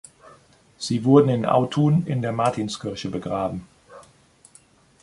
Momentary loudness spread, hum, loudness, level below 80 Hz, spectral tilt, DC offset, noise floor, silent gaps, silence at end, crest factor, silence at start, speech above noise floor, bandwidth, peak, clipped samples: 13 LU; none; -22 LUFS; -56 dBFS; -7 dB/octave; under 0.1%; -55 dBFS; none; 1 s; 22 dB; 0.8 s; 34 dB; 11.5 kHz; -2 dBFS; under 0.1%